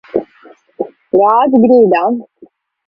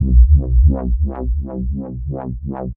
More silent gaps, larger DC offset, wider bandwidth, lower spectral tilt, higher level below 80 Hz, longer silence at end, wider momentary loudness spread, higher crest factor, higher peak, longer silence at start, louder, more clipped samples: neither; neither; first, 5.4 kHz vs 1.8 kHz; second, -9.5 dB/octave vs -14.5 dB/octave; second, -56 dBFS vs -16 dBFS; first, 0.65 s vs 0.05 s; first, 17 LU vs 13 LU; about the same, 12 dB vs 14 dB; about the same, 0 dBFS vs 0 dBFS; first, 0.15 s vs 0 s; first, -11 LUFS vs -18 LUFS; neither